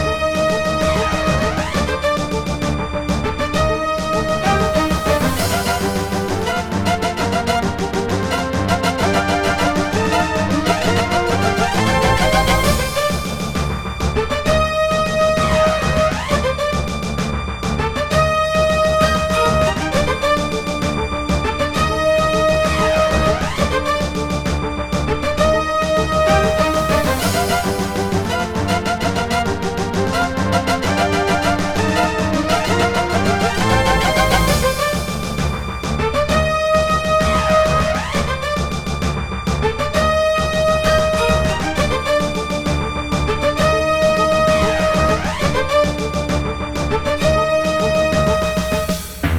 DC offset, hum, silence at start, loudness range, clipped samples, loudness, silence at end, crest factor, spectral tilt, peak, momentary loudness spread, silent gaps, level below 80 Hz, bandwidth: under 0.1%; none; 0 s; 2 LU; under 0.1%; -17 LUFS; 0 s; 16 dB; -5 dB/octave; -2 dBFS; 6 LU; none; -28 dBFS; 19 kHz